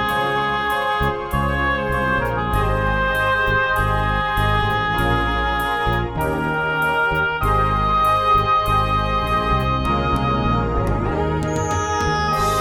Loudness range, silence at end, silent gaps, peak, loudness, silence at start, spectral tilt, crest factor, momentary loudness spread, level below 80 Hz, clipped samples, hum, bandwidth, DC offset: 2 LU; 0 s; none; -6 dBFS; -19 LUFS; 0 s; -5.5 dB/octave; 12 dB; 4 LU; -28 dBFS; under 0.1%; none; 19 kHz; under 0.1%